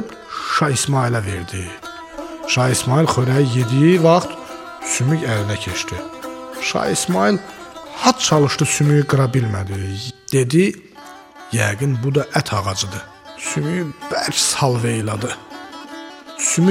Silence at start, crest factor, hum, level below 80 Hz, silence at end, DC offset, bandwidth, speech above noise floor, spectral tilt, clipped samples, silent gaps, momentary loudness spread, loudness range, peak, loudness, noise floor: 0 s; 18 dB; none; -50 dBFS; 0 s; under 0.1%; 16.5 kHz; 22 dB; -4.5 dB/octave; under 0.1%; none; 18 LU; 4 LU; 0 dBFS; -18 LUFS; -40 dBFS